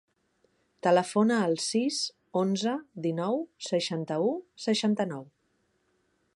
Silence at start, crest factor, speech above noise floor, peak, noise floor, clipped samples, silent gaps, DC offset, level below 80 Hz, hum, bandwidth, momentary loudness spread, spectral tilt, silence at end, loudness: 0.85 s; 18 dB; 45 dB; -12 dBFS; -73 dBFS; under 0.1%; none; under 0.1%; -78 dBFS; none; 11.5 kHz; 8 LU; -4.5 dB/octave; 1.1 s; -29 LUFS